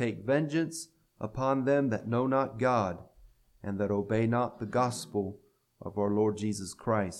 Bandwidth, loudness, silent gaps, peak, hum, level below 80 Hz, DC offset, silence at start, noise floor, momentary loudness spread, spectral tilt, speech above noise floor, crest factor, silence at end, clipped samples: 13.5 kHz; -31 LUFS; none; -14 dBFS; none; -62 dBFS; under 0.1%; 0 s; -59 dBFS; 12 LU; -6.5 dB/octave; 30 dB; 18 dB; 0 s; under 0.1%